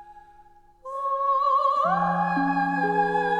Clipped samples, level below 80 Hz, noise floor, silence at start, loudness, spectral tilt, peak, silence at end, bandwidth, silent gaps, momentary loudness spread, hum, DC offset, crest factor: under 0.1%; -62 dBFS; -53 dBFS; 0 s; -23 LUFS; -7 dB/octave; -12 dBFS; 0 s; 10.5 kHz; none; 9 LU; none; under 0.1%; 14 dB